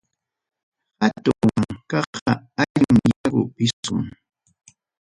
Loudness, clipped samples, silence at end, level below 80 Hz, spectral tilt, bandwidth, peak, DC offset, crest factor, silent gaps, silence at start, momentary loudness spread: -21 LUFS; under 0.1%; 0.95 s; -50 dBFS; -6 dB/octave; 11.5 kHz; -2 dBFS; under 0.1%; 20 dB; 2.06-2.13 s, 2.22-2.26 s, 2.70-2.75 s, 3.16-3.24 s, 3.73-3.83 s; 1 s; 9 LU